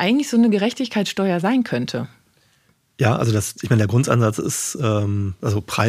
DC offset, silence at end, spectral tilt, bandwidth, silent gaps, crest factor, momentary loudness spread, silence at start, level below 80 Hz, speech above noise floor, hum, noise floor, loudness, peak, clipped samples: under 0.1%; 0 s; -5.5 dB/octave; 15.5 kHz; none; 18 dB; 7 LU; 0 s; -54 dBFS; 42 dB; none; -61 dBFS; -20 LUFS; -2 dBFS; under 0.1%